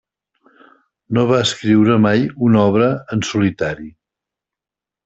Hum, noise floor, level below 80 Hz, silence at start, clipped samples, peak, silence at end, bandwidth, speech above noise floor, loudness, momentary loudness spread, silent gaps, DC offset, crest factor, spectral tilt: none; -88 dBFS; -52 dBFS; 1.1 s; under 0.1%; -2 dBFS; 1.15 s; 8.2 kHz; 73 dB; -16 LUFS; 9 LU; none; under 0.1%; 16 dB; -6 dB/octave